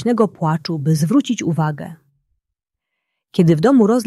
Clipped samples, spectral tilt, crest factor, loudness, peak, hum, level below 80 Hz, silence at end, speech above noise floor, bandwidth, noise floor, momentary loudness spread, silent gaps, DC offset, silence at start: under 0.1%; -7 dB/octave; 16 dB; -17 LUFS; -2 dBFS; none; -58 dBFS; 0 s; 66 dB; 12.5 kHz; -81 dBFS; 11 LU; none; under 0.1%; 0 s